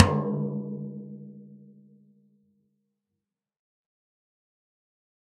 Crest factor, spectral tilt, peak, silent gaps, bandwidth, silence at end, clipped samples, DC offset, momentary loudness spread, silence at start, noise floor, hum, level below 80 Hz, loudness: 32 dB; -7 dB/octave; 0 dBFS; none; 6.6 kHz; 3.65 s; under 0.1%; under 0.1%; 23 LU; 0 s; -85 dBFS; none; -58 dBFS; -29 LUFS